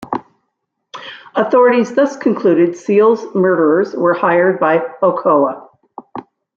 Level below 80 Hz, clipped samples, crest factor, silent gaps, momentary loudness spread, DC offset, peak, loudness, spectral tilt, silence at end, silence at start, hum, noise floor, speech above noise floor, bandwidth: -64 dBFS; under 0.1%; 14 dB; none; 20 LU; under 0.1%; -2 dBFS; -14 LUFS; -7 dB/octave; 0.35 s; 0 s; none; -72 dBFS; 59 dB; 7.4 kHz